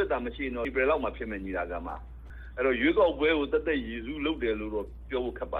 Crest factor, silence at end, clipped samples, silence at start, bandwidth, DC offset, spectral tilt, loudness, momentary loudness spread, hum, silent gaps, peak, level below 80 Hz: 18 dB; 0 s; under 0.1%; 0 s; 4.7 kHz; under 0.1%; -8 dB/octave; -29 LUFS; 13 LU; none; none; -12 dBFS; -44 dBFS